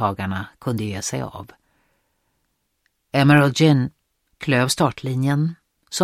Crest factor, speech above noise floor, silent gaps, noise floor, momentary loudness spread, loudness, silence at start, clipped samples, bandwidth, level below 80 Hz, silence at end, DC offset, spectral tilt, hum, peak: 20 dB; 52 dB; none; -71 dBFS; 15 LU; -20 LUFS; 0 s; under 0.1%; 15 kHz; -56 dBFS; 0 s; under 0.1%; -5.5 dB/octave; none; -2 dBFS